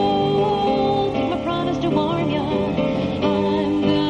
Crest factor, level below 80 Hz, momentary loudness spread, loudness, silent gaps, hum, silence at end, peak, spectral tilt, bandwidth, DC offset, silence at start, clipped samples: 12 dB; -44 dBFS; 3 LU; -20 LUFS; none; none; 0 s; -6 dBFS; -7.5 dB/octave; 9 kHz; under 0.1%; 0 s; under 0.1%